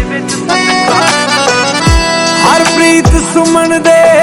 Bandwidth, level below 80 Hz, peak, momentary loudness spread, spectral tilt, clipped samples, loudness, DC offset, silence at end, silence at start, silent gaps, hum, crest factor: 19.5 kHz; -20 dBFS; 0 dBFS; 3 LU; -3.5 dB/octave; 2%; -8 LUFS; under 0.1%; 0 s; 0 s; none; none; 8 dB